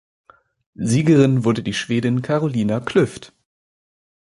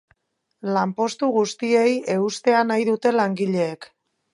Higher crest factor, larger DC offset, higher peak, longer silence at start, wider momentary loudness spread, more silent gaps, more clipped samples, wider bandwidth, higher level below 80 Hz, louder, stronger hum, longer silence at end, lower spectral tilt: about the same, 18 dB vs 18 dB; neither; about the same, -2 dBFS vs -4 dBFS; first, 0.8 s vs 0.65 s; first, 9 LU vs 6 LU; neither; neither; about the same, 11.5 kHz vs 11.5 kHz; first, -54 dBFS vs -74 dBFS; about the same, -19 LUFS vs -21 LUFS; neither; first, 0.95 s vs 0.5 s; about the same, -6.5 dB/octave vs -5.5 dB/octave